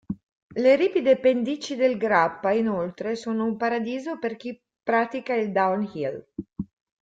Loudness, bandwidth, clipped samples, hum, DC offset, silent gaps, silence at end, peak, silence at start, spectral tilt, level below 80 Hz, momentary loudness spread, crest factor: -24 LUFS; 7.8 kHz; under 0.1%; none; under 0.1%; 0.23-0.50 s; 0.35 s; -6 dBFS; 0.1 s; -6 dB/octave; -62 dBFS; 17 LU; 18 dB